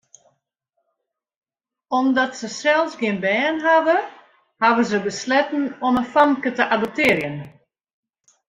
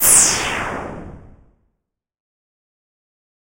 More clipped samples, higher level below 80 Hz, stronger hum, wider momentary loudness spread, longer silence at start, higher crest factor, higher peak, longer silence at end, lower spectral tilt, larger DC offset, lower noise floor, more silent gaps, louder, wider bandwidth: neither; second, -60 dBFS vs -44 dBFS; neither; second, 7 LU vs 23 LU; first, 1.9 s vs 0 s; about the same, 20 dB vs 22 dB; about the same, -2 dBFS vs 0 dBFS; second, 1 s vs 2.4 s; first, -4.5 dB/octave vs -0.5 dB/octave; neither; about the same, -79 dBFS vs -77 dBFS; neither; second, -19 LUFS vs -14 LUFS; about the same, 15.5 kHz vs 16.5 kHz